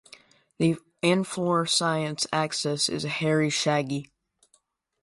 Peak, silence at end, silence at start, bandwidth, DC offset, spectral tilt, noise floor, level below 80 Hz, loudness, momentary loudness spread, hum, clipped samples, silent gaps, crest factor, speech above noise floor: -8 dBFS; 1 s; 0.6 s; 11.5 kHz; under 0.1%; -4 dB/octave; -68 dBFS; -66 dBFS; -26 LUFS; 4 LU; none; under 0.1%; none; 18 dB; 43 dB